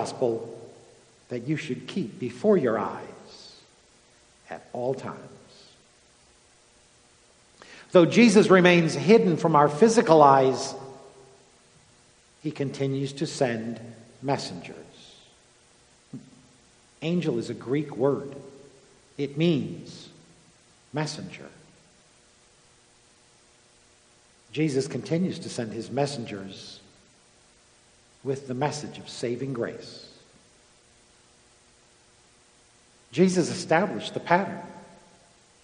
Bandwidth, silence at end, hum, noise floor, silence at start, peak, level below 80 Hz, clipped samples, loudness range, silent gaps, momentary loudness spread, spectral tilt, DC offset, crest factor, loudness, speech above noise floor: 10 kHz; 0.8 s; none; -59 dBFS; 0 s; -2 dBFS; -70 dBFS; under 0.1%; 19 LU; none; 26 LU; -6 dB/octave; under 0.1%; 26 dB; -24 LUFS; 35 dB